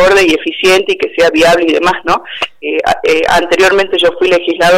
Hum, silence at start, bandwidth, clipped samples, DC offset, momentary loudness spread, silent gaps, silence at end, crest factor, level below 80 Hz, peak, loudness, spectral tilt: none; 0 s; 16.5 kHz; under 0.1%; under 0.1%; 6 LU; none; 0 s; 8 dB; -38 dBFS; -2 dBFS; -10 LUFS; -3.5 dB/octave